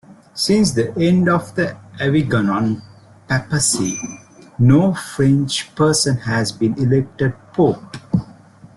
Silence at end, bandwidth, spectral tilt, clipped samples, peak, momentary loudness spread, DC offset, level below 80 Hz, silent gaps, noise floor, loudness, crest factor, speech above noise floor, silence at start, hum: 0.45 s; 12.5 kHz; -5 dB/octave; under 0.1%; -2 dBFS; 8 LU; under 0.1%; -48 dBFS; none; -43 dBFS; -18 LUFS; 16 dB; 26 dB; 0.1 s; none